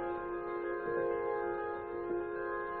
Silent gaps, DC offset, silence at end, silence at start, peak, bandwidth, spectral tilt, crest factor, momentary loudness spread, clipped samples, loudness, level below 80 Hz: none; under 0.1%; 0 s; 0 s; -24 dBFS; 4.3 kHz; -5.5 dB/octave; 12 dB; 4 LU; under 0.1%; -37 LUFS; -62 dBFS